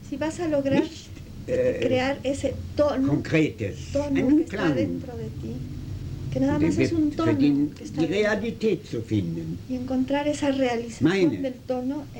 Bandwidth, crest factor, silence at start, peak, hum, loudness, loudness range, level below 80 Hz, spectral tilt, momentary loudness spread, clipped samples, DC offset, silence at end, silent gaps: 16.5 kHz; 16 dB; 0 s; -8 dBFS; none; -25 LUFS; 2 LU; -46 dBFS; -6.5 dB/octave; 12 LU; under 0.1%; under 0.1%; 0 s; none